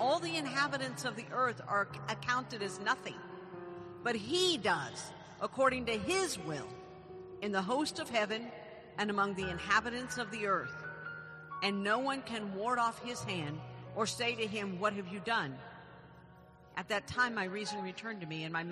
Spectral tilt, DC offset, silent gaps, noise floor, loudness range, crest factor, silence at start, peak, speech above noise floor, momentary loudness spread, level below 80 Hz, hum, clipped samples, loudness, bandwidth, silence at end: -3.5 dB/octave; under 0.1%; none; -58 dBFS; 3 LU; 22 dB; 0 s; -16 dBFS; 22 dB; 16 LU; -66 dBFS; none; under 0.1%; -35 LUFS; 13 kHz; 0 s